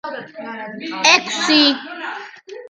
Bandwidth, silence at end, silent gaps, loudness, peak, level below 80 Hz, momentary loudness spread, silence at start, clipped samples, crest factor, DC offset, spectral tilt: 11 kHz; 0.05 s; none; -14 LUFS; 0 dBFS; -68 dBFS; 19 LU; 0.05 s; under 0.1%; 20 dB; under 0.1%; -1 dB/octave